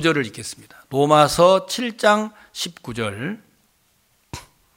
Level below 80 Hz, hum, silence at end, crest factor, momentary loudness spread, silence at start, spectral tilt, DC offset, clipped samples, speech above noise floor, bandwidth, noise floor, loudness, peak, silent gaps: -52 dBFS; none; 0.35 s; 20 dB; 23 LU; 0 s; -4.5 dB/octave; under 0.1%; under 0.1%; 43 dB; 17 kHz; -63 dBFS; -19 LUFS; 0 dBFS; none